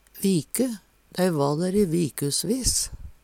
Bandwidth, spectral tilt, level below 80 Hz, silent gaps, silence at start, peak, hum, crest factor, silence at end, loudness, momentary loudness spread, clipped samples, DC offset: 18 kHz; -4.5 dB/octave; -44 dBFS; none; 0.15 s; -6 dBFS; none; 18 dB; 0.1 s; -24 LUFS; 7 LU; under 0.1%; under 0.1%